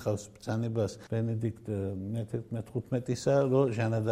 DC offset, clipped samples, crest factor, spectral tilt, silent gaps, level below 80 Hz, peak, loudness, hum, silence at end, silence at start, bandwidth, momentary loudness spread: under 0.1%; under 0.1%; 18 dB; -7.5 dB/octave; none; -62 dBFS; -14 dBFS; -32 LUFS; none; 0 s; 0 s; 12.5 kHz; 10 LU